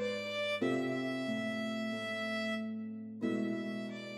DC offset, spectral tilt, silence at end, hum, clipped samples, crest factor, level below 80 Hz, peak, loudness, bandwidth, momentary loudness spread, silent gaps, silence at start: under 0.1%; -5.5 dB/octave; 0 s; none; under 0.1%; 16 dB; -86 dBFS; -22 dBFS; -37 LUFS; 13.5 kHz; 7 LU; none; 0 s